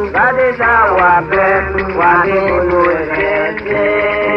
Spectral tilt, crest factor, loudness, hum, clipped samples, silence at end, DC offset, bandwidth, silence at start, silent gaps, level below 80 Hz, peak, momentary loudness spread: -8 dB/octave; 12 dB; -12 LUFS; none; under 0.1%; 0 s; under 0.1%; 6.2 kHz; 0 s; none; -34 dBFS; 0 dBFS; 5 LU